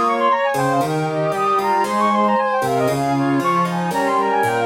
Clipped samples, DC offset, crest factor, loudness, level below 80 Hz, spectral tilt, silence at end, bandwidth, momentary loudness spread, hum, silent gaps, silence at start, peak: under 0.1%; under 0.1%; 12 dB; -18 LUFS; -58 dBFS; -5.5 dB/octave; 0 s; 17 kHz; 3 LU; none; none; 0 s; -6 dBFS